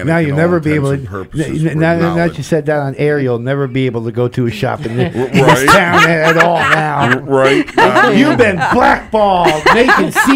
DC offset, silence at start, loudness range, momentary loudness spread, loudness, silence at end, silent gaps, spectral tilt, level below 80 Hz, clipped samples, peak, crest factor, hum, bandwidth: under 0.1%; 0 s; 6 LU; 9 LU; -11 LUFS; 0 s; none; -5.5 dB/octave; -38 dBFS; 0.3%; 0 dBFS; 12 dB; none; 16.5 kHz